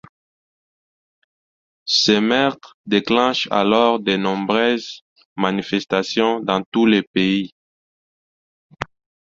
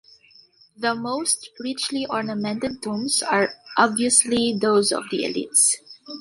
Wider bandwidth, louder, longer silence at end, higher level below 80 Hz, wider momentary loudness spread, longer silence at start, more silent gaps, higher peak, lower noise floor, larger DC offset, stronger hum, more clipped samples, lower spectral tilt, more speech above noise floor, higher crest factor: second, 7.8 kHz vs 12 kHz; first, -18 LUFS vs -21 LUFS; first, 0.35 s vs 0 s; about the same, -58 dBFS vs -62 dBFS; first, 17 LU vs 10 LU; first, 1.85 s vs 0.8 s; first, 2.74-2.84 s, 5.01-5.16 s, 5.25-5.36 s, 6.66-6.72 s, 7.07-7.14 s, 7.52-8.70 s vs none; about the same, -2 dBFS vs -2 dBFS; first, under -90 dBFS vs -54 dBFS; neither; neither; neither; first, -4.5 dB/octave vs -2 dB/octave; first, over 72 dB vs 32 dB; about the same, 20 dB vs 22 dB